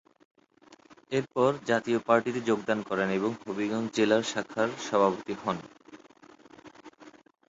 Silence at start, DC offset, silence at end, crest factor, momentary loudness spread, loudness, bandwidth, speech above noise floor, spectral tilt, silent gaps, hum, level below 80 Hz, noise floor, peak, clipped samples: 1.1 s; under 0.1%; 0.4 s; 22 dB; 8 LU; -28 LUFS; 8 kHz; 30 dB; -5 dB/octave; none; none; -70 dBFS; -58 dBFS; -8 dBFS; under 0.1%